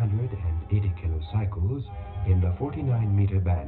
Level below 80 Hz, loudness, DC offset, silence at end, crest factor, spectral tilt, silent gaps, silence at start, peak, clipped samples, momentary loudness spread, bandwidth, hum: -36 dBFS; -27 LUFS; under 0.1%; 0 s; 14 dB; -12.5 dB/octave; none; 0 s; -12 dBFS; under 0.1%; 7 LU; 4.1 kHz; none